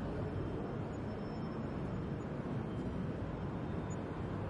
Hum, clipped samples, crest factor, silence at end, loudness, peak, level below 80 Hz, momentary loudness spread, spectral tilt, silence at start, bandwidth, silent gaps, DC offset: none; under 0.1%; 12 dB; 0 s; -41 LUFS; -28 dBFS; -52 dBFS; 2 LU; -8 dB/octave; 0 s; 11 kHz; none; under 0.1%